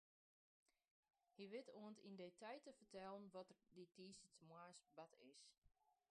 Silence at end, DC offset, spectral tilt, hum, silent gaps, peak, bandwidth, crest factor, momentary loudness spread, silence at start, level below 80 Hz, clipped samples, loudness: 0.15 s; under 0.1%; -4.5 dB/octave; none; 5.58-5.62 s; -44 dBFS; 10 kHz; 20 dB; 9 LU; 1.35 s; under -90 dBFS; under 0.1%; -61 LUFS